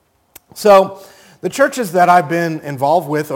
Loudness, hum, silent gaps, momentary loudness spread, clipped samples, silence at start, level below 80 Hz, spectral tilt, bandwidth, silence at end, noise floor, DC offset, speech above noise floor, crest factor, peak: -14 LUFS; none; none; 12 LU; under 0.1%; 0.55 s; -62 dBFS; -5 dB/octave; 17 kHz; 0 s; -47 dBFS; under 0.1%; 34 dB; 14 dB; 0 dBFS